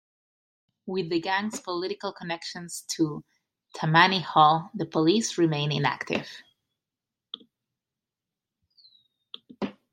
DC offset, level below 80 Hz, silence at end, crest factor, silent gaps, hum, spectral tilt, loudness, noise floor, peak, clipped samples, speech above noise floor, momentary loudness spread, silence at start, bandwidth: under 0.1%; -72 dBFS; 0.2 s; 26 dB; none; none; -4.5 dB/octave; -26 LUFS; -89 dBFS; -2 dBFS; under 0.1%; 63 dB; 22 LU; 0.85 s; 16 kHz